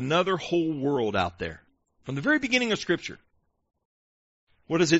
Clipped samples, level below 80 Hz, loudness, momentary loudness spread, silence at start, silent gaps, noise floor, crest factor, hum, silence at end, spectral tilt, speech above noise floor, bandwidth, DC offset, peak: under 0.1%; -58 dBFS; -27 LUFS; 13 LU; 0 s; 3.85-4.47 s; under -90 dBFS; 20 dB; none; 0 s; -3.5 dB/octave; over 64 dB; 8 kHz; under 0.1%; -8 dBFS